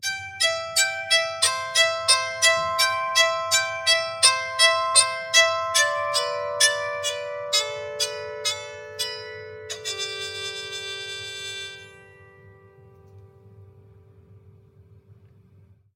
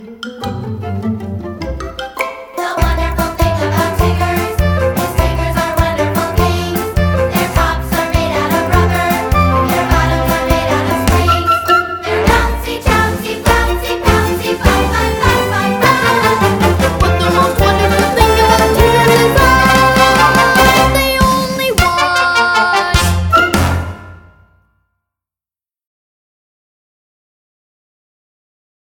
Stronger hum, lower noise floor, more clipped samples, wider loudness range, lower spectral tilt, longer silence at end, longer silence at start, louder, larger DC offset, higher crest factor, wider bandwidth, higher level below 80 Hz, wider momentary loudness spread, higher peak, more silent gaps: neither; second, -55 dBFS vs under -90 dBFS; second, under 0.1% vs 0.2%; first, 16 LU vs 7 LU; second, 1.5 dB/octave vs -5 dB/octave; second, 0.8 s vs 4.75 s; about the same, 0 s vs 0 s; second, -21 LUFS vs -12 LUFS; neither; first, 24 dB vs 12 dB; second, 17.5 kHz vs 19.5 kHz; second, -70 dBFS vs -22 dBFS; about the same, 14 LU vs 12 LU; about the same, -2 dBFS vs 0 dBFS; neither